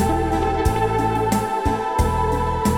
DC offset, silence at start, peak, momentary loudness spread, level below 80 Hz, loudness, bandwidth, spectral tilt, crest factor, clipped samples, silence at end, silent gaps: under 0.1%; 0 s; -6 dBFS; 2 LU; -28 dBFS; -21 LUFS; 18 kHz; -6 dB/octave; 14 dB; under 0.1%; 0 s; none